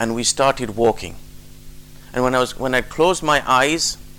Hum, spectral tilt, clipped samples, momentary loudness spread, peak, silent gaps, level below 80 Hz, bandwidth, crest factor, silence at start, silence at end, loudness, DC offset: 50 Hz at -45 dBFS; -3 dB/octave; under 0.1%; 7 LU; -6 dBFS; none; -40 dBFS; 18.5 kHz; 14 dB; 0 s; 0 s; -18 LUFS; 0.3%